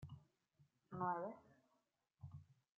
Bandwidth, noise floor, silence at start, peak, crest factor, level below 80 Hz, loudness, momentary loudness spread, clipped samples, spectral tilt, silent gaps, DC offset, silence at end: 7 kHz; -85 dBFS; 0 s; -32 dBFS; 20 dB; -82 dBFS; -47 LUFS; 19 LU; under 0.1%; -7.5 dB/octave; none; under 0.1%; 0.25 s